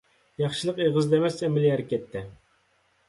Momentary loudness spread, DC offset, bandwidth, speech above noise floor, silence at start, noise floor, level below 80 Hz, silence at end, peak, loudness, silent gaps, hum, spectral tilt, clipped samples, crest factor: 15 LU; under 0.1%; 11.5 kHz; 42 dB; 0.4 s; -67 dBFS; -62 dBFS; 0.75 s; -10 dBFS; -25 LUFS; none; none; -6.5 dB/octave; under 0.1%; 16 dB